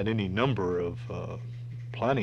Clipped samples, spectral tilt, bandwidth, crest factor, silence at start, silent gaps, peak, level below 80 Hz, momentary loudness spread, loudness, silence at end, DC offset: under 0.1%; -8 dB/octave; 7 kHz; 18 dB; 0 s; none; -12 dBFS; -56 dBFS; 12 LU; -31 LUFS; 0 s; under 0.1%